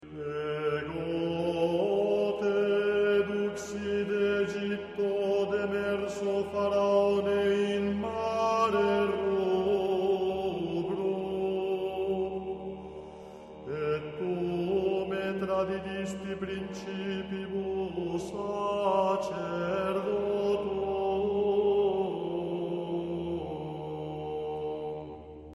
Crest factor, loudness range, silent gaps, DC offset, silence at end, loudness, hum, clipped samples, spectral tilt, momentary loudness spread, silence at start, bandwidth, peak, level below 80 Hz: 16 dB; 6 LU; none; under 0.1%; 0 s; -30 LUFS; none; under 0.1%; -6.5 dB/octave; 10 LU; 0 s; 11.5 kHz; -14 dBFS; -58 dBFS